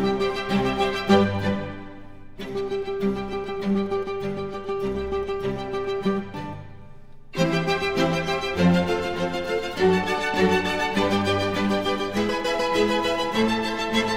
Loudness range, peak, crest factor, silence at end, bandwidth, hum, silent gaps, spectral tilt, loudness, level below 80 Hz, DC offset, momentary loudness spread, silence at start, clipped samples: 6 LU; -6 dBFS; 18 dB; 0 s; 16 kHz; none; none; -5.5 dB/octave; -24 LUFS; -46 dBFS; under 0.1%; 9 LU; 0 s; under 0.1%